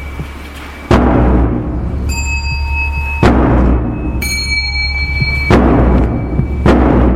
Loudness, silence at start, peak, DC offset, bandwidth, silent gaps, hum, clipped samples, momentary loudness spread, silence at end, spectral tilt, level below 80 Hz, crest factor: -13 LUFS; 0 s; 0 dBFS; under 0.1%; 14.5 kHz; none; none; under 0.1%; 9 LU; 0 s; -6 dB/octave; -16 dBFS; 12 dB